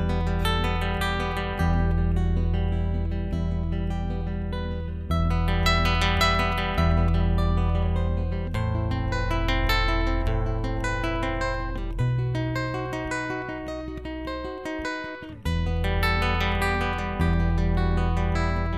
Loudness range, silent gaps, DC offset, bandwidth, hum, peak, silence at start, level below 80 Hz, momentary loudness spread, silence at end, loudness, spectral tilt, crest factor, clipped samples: 6 LU; none; 0.2%; 14.5 kHz; none; -8 dBFS; 0 s; -28 dBFS; 9 LU; 0 s; -26 LUFS; -6 dB/octave; 16 dB; under 0.1%